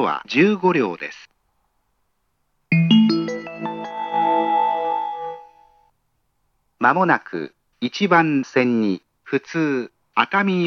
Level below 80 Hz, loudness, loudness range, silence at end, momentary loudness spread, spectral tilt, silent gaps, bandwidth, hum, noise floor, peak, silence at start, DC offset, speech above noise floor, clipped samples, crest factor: -72 dBFS; -20 LUFS; 4 LU; 0 s; 14 LU; -6.5 dB/octave; none; 6.8 kHz; none; -71 dBFS; 0 dBFS; 0 s; under 0.1%; 51 dB; under 0.1%; 20 dB